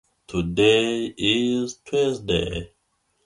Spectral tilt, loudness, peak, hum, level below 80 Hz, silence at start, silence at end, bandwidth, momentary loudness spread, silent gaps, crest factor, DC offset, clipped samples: -4.5 dB/octave; -22 LUFS; -6 dBFS; none; -44 dBFS; 0.3 s; 0.6 s; 11.5 kHz; 11 LU; none; 18 dB; under 0.1%; under 0.1%